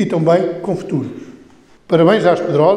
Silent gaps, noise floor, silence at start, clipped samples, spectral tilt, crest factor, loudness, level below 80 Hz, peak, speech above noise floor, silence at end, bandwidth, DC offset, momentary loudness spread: none; -45 dBFS; 0 s; under 0.1%; -7.5 dB/octave; 14 dB; -15 LUFS; -58 dBFS; 0 dBFS; 31 dB; 0 s; 10.5 kHz; under 0.1%; 11 LU